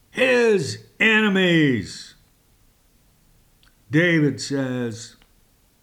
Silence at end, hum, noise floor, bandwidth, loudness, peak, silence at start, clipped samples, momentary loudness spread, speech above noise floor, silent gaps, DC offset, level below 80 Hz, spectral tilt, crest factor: 0.75 s; none; -59 dBFS; 17 kHz; -19 LUFS; -6 dBFS; 0.15 s; under 0.1%; 16 LU; 39 dB; none; under 0.1%; -60 dBFS; -5.5 dB/octave; 16 dB